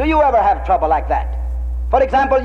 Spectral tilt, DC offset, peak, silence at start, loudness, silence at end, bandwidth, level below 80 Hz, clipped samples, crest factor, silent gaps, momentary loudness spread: -8 dB/octave; under 0.1%; -2 dBFS; 0 s; -16 LUFS; 0 s; 6.6 kHz; -24 dBFS; under 0.1%; 14 dB; none; 11 LU